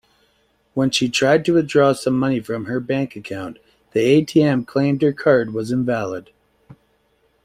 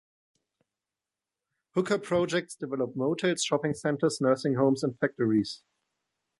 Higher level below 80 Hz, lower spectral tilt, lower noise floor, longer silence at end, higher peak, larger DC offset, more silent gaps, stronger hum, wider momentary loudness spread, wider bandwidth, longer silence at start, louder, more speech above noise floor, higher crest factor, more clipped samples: first, -56 dBFS vs -68 dBFS; about the same, -5.5 dB/octave vs -5 dB/octave; second, -62 dBFS vs under -90 dBFS; first, 1.25 s vs 0.85 s; first, -2 dBFS vs -12 dBFS; neither; neither; neither; first, 13 LU vs 7 LU; first, 15 kHz vs 11.5 kHz; second, 0.75 s vs 1.75 s; first, -19 LUFS vs -28 LUFS; second, 44 dB vs over 62 dB; about the same, 18 dB vs 18 dB; neither